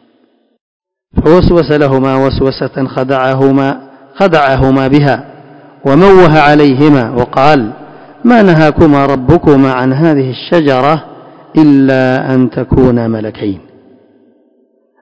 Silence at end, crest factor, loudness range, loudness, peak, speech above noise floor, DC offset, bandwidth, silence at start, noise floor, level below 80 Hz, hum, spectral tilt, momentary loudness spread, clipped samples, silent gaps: 1.45 s; 10 dB; 4 LU; -9 LUFS; 0 dBFS; 45 dB; under 0.1%; 8 kHz; 1.15 s; -53 dBFS; -28 dBFS; none; -8.5 dB/octave; 10 LU; 5%; none